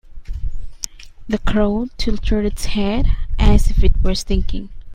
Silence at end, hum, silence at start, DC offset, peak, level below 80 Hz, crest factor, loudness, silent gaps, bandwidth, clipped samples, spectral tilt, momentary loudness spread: 0 s; none; 0.1 s; under 0.1%; 0 dBFS; -18 dBFS; 16 dB; -21 LUFS; none; 15 kHz; under 0.1%; -6 dB/octave; 14 LU